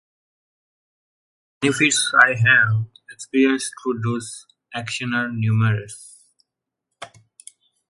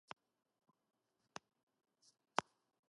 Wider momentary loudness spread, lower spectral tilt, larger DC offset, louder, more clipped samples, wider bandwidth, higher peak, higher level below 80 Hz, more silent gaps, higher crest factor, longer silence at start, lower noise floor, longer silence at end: first, 24 LU vs 15 LU; first, -4 dB/octave vs -2.5 dB/octave; neither; first, -19 LUFS vs -44 LUFS; neither; about the same, 11.5 kHz vs 11 kHz; first, 0 dBFS vs -16 dBFS; first, -62 dBFS vs under -90 dBFS; neither; second, 22 dB vs 38 dB; second, 1.6 s vs 2.4 s; first, -82 dBFS vs -60 dBFS; first, 0.85 s vs 0.5 s